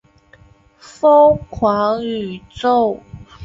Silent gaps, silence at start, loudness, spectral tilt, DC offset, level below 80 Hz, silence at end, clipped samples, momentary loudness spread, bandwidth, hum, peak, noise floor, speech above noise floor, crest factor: none; 1.05 s; -15 LUFS; -6.5 dB/octave; under 0.1%; -46 dBFS; 0 s; under 0.1%; 14 LU; 7.6 kHz; none; -2 dBFS; -48 dBFS; 34 dB; 14 dB